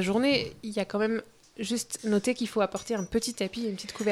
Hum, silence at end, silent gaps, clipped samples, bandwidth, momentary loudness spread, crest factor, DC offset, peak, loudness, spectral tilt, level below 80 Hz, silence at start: none; 0 s; none; under 0.1%; 15.5 kHz; 8 LU; 18 dB; under 0.1%; -12 dBFS; -30 LUFS; -4 dB/octave; -58 dBFS; 0 s